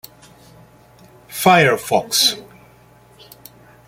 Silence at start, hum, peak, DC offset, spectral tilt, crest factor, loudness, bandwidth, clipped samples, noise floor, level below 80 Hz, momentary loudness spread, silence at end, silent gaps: 1.3 s; none; -2 dBFS; under 0.1%; -3 dB/octave; 20 dB; -15 LUFS; 16.5 kHz; under 0.1%; -49 dBFS; -58 dBFS; 16 LU; 1.45 s; none